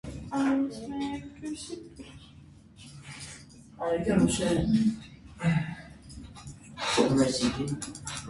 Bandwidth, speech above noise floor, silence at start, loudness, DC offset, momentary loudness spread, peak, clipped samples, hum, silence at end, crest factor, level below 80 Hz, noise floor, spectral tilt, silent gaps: 11.5 kHz; 24 dB; 0.05 s; -29 LUFS; under 0.1%; 22 LU; -10 dBFS; under 0.1%; none; 0 s; 20 dB; -50 dBFS; -52 dBFS; -5 dB/octave; none